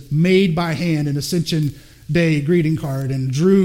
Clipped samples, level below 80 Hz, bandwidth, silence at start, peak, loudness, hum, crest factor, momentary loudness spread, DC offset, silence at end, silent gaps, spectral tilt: under 0.1%; -46 dBFS; 16.5 kHz; 0 s; -2 dBFS; -18 LUFS; none; 14 dB; 7 LU; under 0.1%; 0 s; none; -6.5 dB/octave